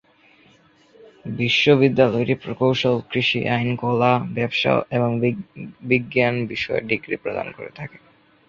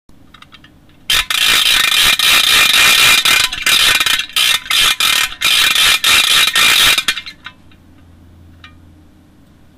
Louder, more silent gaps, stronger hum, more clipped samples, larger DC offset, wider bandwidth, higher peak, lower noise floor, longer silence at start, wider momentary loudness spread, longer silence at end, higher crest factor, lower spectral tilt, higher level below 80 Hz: second, -20 LUFS vs -9 LUFS; neither; neither; neither; neither; second, 7.2 kHz vs 16.5 kHz; about the same, -2 dBFS vs -2 dBFS; first, -55 dBFS vs -45 dBFS; first, 1.25 s vs 1.1 s; first, 17 LU vs 6 LU; second, 0.5 s vs 2.3 s; first, 20 dB vs 12 dB; first, -6.5 dB/octave vs 1.5 dB/octave; second, -56 dBFS vs -40 dBFS